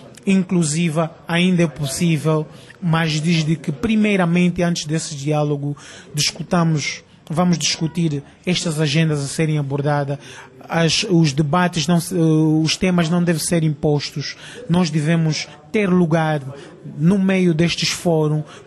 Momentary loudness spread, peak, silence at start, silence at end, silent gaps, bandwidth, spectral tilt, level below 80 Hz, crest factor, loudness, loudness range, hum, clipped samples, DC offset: 9 LU; -6 dBFS; 0 s; 0.05 s; none; 13 kHz; -5.5 dB/octave; -50 dBFS; 14 dB; -19 LUFS; 3 LU; none; under 0.1%; under 0.1%